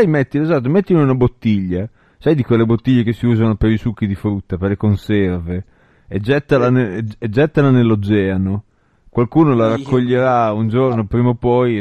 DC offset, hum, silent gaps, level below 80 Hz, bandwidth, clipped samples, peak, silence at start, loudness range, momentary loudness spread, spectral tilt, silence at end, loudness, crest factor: under 0.1%; none; none; -38 dBFS; 7 kHz; under 0.1%; 0 dBFS; 0 s; 3 LU; 9 LU; -9.5 dB/octave; 0 s; -16 LUFS; 14 dB